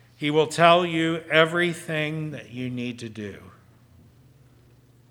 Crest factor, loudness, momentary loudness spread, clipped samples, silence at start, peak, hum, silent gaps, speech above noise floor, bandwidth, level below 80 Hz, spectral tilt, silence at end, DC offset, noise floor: 24 dB; -23 LUFS; 17 LU; under 0.1%; 0.2 s; 0 dBFS; none; none; 32 dB; 17.5 kHz; -68 dBFS; -5 dB/octave; 1.6 s; under 0.1%; -55 dBFS